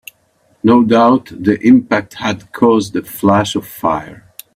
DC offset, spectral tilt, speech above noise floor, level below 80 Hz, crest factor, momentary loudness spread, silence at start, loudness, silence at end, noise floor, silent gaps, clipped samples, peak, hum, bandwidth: under 0.1%; -6 dB/octave; 44 dB; -50 dBFS; 14 dB; 11 LU; 0.65 s; -13 LUFS; 0.4 s; -56 dBFS; none; under 0.1%; 0 dBFS; none; 16 kHz